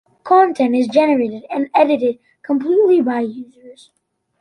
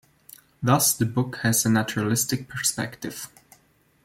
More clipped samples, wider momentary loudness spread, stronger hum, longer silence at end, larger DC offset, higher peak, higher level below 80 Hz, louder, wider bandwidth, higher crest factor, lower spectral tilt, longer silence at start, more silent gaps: neither; second, 10 LU vs 15 LU; neither; about the same, 0.7 s vs 0.8 s; neither; first, -2 dBFS vs -6 dBFS; second, -66 dBFS vs -60 dBFS; first, -16 LUFS vs -23 LUFS; second, 11 kHz vs 16.5 kHz; second, 14 dB vs 20 dB; first, -6 dB/octave vs -4 dB/octave; second, 0.25 s vs 0.6 s; neither